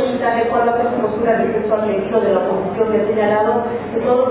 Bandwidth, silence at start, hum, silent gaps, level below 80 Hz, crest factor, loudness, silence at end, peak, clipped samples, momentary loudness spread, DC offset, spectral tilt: 4 kHz; 0 s; none; none; -48 dBFS; 14 dB; -17 LUFS; 0 s; -2 dBFS; under 0.1%; 3 LU; under 0.1%; -10.5 dB/octave